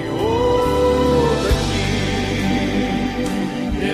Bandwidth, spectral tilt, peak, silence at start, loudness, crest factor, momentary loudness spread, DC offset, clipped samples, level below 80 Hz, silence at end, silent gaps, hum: 15.5 kHz; -5.5 dB/octave; -4 dBFS; 0 s; -19 LUFS; 14 dB; 6 LU; under 0.1%; under 0.1%; -28 dBFS; 0 s; none; none